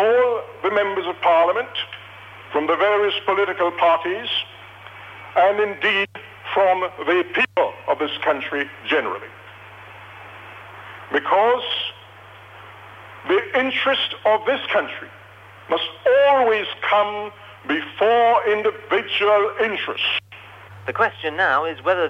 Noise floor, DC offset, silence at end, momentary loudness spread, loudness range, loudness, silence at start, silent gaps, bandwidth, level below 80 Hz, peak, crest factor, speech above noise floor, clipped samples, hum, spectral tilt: -44 dBFS; under 0.1%; 0 s; 22 LU; 5 LU; -20 LUFS; 0 s; none; 9.4 kHz; -68 dBFS; -6 dBFS; 16 dB; 24 dB; under 0.1%; none; -5 dB/octave